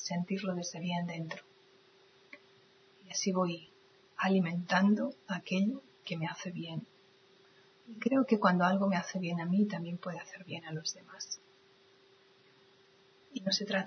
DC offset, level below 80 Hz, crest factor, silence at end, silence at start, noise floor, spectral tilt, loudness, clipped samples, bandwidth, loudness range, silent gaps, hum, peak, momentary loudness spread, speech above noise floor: under 0.1%; -86 dBFS; 24 dB; 0 s; 0 s; -64 dBFS; -5 dB/octave; -34 LUFS; under 0.1%; 6.6 kHz; 8 LU; none; none; -12 dBFS; 17 LU; 31 dB